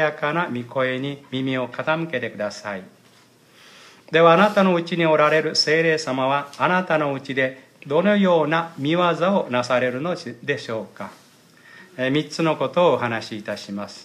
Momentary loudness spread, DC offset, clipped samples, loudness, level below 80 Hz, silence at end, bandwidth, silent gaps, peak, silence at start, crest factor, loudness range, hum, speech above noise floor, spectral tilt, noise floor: 13 LU; under 0.1%; under 0.1%; -21 LUFS; -72 dBFS; 0 s; 13.5 kHz; none; -2 dBFS; 0 s; 18 dB; 7 LU; none; 33 dB; -5.5 dB/octave; -53 dBFS